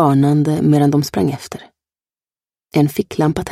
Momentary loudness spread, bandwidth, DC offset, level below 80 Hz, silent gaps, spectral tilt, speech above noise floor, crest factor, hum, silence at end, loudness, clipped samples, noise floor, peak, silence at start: 13 LU; 15.5 kHz; under 0.1%; -48 dBFS; none; -7.5 dB/octave; over 75 dB; 16 dB; none; 0 s; -16 LUFS; under 0.1%; under -90 dBFS; -2 dBFS; 0 s